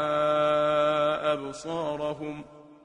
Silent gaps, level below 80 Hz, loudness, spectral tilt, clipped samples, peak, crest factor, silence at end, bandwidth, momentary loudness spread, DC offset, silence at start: none; -62 dBFS; -26 LUFS; -5 dB/octave; under 0.1%; -12 dBFS; 16 dB; 0.1 s; 10 kHz; 12 LU; under 0.1%; 0 s